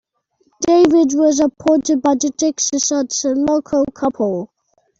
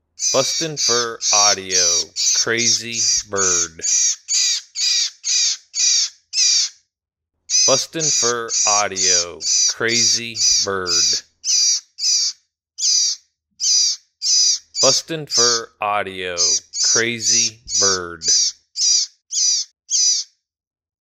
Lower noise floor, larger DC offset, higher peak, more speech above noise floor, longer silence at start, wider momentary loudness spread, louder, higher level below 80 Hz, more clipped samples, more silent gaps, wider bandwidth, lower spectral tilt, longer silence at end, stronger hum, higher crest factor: second, -62 dBFS vs -81 dBFS; neither; about the same, -2 dBFS vs 0 dBFS; second, 47 dB vs 62 dB; first, 0.6 s vs 0.2 s; about the same, 8 LU vs 6 LU; about the same, -16 LUFS vs -16 LUFS; first, -54 dBFS vs -60 dBFS; neither; neither; second, 7.8 kHz vs 16.5 kHz; first, -3.5 dB/octave vs 0.5 dB/octave; second, 0.55 s vs 0.75 s; neither; about the same, 14 dB vs 18 dB